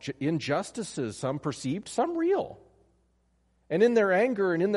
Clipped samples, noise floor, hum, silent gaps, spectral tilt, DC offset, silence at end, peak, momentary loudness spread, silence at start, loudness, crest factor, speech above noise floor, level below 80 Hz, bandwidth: under 0.1%; -69 dBFS; none; none; -5.5 dB/octave; under 0.1%; 0 s; -10 dBFS; 11 LU; 0.05 s; -28 LUFS; 18 dB; 42 dB; -66 dBFS; 11.5 kHz